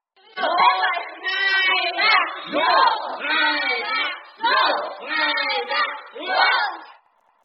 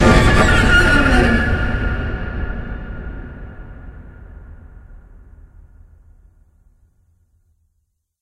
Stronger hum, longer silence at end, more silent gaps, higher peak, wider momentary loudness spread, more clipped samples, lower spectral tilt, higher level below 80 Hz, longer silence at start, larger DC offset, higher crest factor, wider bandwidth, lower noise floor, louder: neither; second, 0.5 s vs 3.25 s; neither; second, -4 dBFS vs 0 dBFS; second, 9 LU vs 25 LU; neither; second, -3.5 dB/octave vs -5.5 dB/octave; second, -84 dBFS vs -24 dBFS; first, 0.35 s vs 0 s; neither; about the same, 18 dB vs 18 dB; second, 6 kHz vs 13 kHz; second, -58 dBFS vs -69 dBFS; second, -20 LUFS vs -15 LUFS